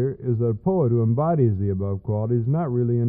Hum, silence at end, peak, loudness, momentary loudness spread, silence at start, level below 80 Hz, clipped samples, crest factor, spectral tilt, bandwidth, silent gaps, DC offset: none; 0 s; -8 dBFS; -22 LUFS; 5 LU; 0 s; -52 dBFS; under 0.1%; 12 dB; -15.5 dB/octave; 2.4 kHz; none; under 0.1%